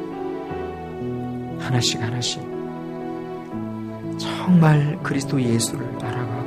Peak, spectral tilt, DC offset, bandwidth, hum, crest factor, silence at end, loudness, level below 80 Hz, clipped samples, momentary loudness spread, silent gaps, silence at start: -4 dBFS; -5.5 dB/octave; under 0.1%; 14.5 kHz; none; 20 dB; 0 s; -23 LUFS; -52 dBFS; under 0.1%; 14 LU; none; 0 s